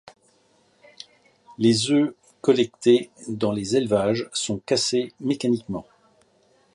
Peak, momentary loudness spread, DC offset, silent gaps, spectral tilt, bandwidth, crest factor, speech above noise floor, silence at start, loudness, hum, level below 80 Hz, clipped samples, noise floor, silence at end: -6 dBFS; 14 LU; under 0.1%; none; -4.5 dB/octave; 11.5 kHz; 18 dB; 40 dB; 1.5 s; -23 LUFS; none; -60 dBFS; under 0.1%; -62 dBFS; 0.95 s